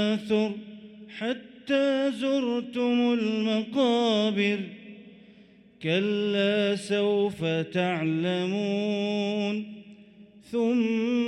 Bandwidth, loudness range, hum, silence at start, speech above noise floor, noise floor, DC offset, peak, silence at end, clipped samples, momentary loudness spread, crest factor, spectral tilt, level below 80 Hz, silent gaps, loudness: 11.5 kHz; 3 LU; none; 0 s; 29 dB; -54 dBFS; under 0.1%; -12 dBFS; 0 s; under 0.1%; 11 LU; 14 dB; -6 dB/octave; -72 dBFS; none; -26 LUFS